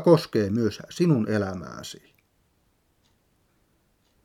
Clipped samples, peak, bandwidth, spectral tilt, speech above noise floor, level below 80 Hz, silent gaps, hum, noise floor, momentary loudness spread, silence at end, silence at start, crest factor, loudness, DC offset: under 0.1%; -6 dBFS; 15.5 kHz; -7 dB/octave; 44 dB; -64 dBFS; none; none; -68 dBFS; 18 LU; 2.3 s; 0 s; 22 dB; -25 LUFS; under 0.1%